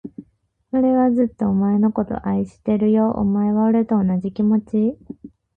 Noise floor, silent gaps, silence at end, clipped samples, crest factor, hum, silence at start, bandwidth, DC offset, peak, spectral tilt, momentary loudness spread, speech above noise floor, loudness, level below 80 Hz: -61 dBFS; none; 0.3 s; under 0.1%; 12 dB; none; 0.05 s; 3.4 kHz; under 0.1%; -6 dBFS; -11 dB/octave; 7 LU; 43 dB; -19 LUFS; -50 dBFS